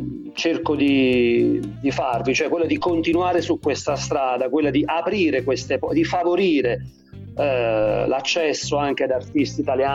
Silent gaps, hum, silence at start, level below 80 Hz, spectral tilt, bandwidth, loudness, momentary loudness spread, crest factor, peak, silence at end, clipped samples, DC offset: none; none; 0 s; -48 dBFS; -5 dB/octave; 9.6 kHz; -21 LUFS; 5 LU; 12 dB; -8 dBFS; 0 s; under 0.1%; under 0.1%